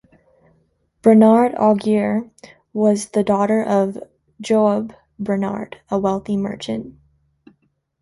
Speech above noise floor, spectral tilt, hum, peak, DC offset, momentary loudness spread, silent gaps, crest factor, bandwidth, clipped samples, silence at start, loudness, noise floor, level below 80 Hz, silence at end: 46 dB; -7 dB/octave; none; -2 dBFS; under 0.1%; 17 LU; none; 18 dB; 11.5 kHz; under 0.1%; 1.05 s; -18 LUFS; -63 dBFS; -56 dBFS; 1.1 s